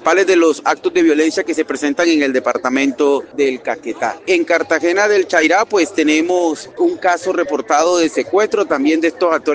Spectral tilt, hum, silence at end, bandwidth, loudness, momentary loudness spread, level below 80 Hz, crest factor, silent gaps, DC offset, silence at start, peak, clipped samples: -3 dB/octave; none; 0 s; 9.8 kHz; -15 LUFS; 6 LU; -62 dBFS; 14 dB; none; under 0.1%; 0 s; 0 dBFS; under 0.1%